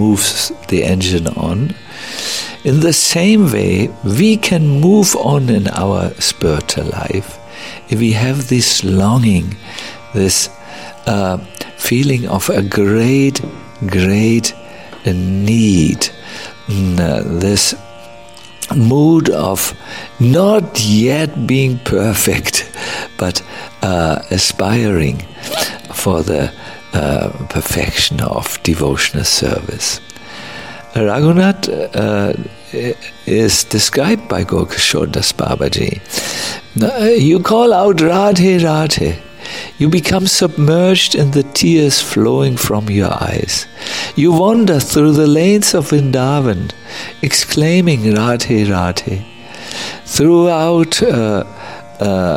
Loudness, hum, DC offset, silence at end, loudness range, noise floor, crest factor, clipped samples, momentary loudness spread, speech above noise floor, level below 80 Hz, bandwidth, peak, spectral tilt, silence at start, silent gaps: -13 LUFS; none; 0.9%; 0 s; 4 LU; -37 dBFS; 12 dB; under 0.1%; 13 LU; 24 dB; -36 dBFS; 16.5 kHz; 0 dBFS; -4.5 dB/octave; 0 s; none